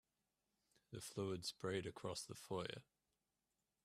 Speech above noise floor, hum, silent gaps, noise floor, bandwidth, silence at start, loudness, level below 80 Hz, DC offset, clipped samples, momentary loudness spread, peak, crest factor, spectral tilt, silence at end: over 42 dB; none; none; under -90 dBFS; 15.5 kHz; 0.9 s; -48 LUFS; -80 dBFS; under 0.1%; under 0.1%; 9 LU; -30 dBFS; 20 dB; -4.5 dB/octave; 1 s